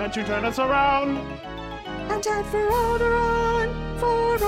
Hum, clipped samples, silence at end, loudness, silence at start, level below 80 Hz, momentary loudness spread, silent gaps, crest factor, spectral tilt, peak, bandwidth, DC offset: none; under 0.1%; 0 s; -23 LUFS; 0 s; -36 dBFS; 13 LU; none; 14 dB; -5 dB/octave; -10 dBFS; 16.5 kHz; under 0.1%